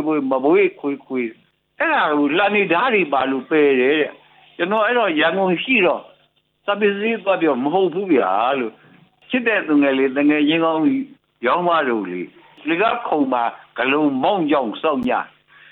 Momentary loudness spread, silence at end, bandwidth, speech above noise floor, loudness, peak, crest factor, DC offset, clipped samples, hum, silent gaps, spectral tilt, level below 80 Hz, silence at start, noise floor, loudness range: 9 LU; 0.45 s; 4.3 kHz; 43 dB; -18 LUFS; -4 dBFS; 14 dB; under 0.1%; under 0.1%; none; none; -8.5 dB/octave; -66 dBFS; 0 s; -61 dBFS; 2 LU